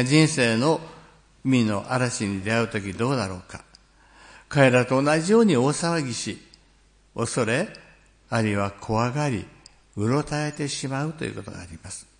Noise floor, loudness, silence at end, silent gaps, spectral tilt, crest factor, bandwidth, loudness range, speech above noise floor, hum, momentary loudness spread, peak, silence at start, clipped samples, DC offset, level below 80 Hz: -58 dBFS; -24 LUFS; 0.15 s; none; -5.5 dB/octave; 22 dB; 10.5 kHz; 5 LU; 35 dB; none; 19 LU; -4 dBFS; 0 s; under 0.1%; under 0.1%; -56 dBFS